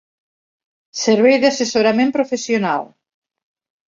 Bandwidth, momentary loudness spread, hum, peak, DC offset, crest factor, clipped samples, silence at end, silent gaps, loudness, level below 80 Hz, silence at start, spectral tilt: 7.6 kHz; 10 LU; none; -2 dBFS; under 0.1%; 16 dB; under 0.1%; 1.05 s; none; -16 LUFS; -62 dBFS; 0.95 s; -4 dB/octave